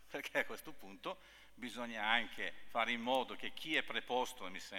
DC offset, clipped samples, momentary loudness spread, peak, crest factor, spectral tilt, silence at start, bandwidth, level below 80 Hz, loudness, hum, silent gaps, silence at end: under 0.1%; under 0.1%; 13 LU; -18 dBFS; 22 dB; -2.5 dB/octave; 0 s; 19 kHz; -72 dBFS; -39 LUFS; none; none; 0 s